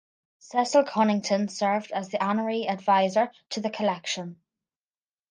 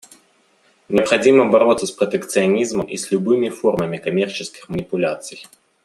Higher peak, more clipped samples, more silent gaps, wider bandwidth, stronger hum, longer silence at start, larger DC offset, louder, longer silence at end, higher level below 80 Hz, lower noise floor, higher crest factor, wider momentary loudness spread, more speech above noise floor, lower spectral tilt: second, -8 dBFS vs 0 dBFS; neither; neither; second, 10 kHz vs 13 kHz; neither; second, 0.55 s vs 0.9 s; neither; second, -26 LUFS vs -18 LUFS; first, 0.95 s vs 0.4 s; second, -78 dBFS vs -56 dBFS; first, under -90 dBFS vs -58 dBFS; about the same, 18 dB vs 18 dB; second, 9 LU vs 14 LU; first, over 65 dB vs 40 dB; about the same, -4.5 dB/octave vs -5 dB/octave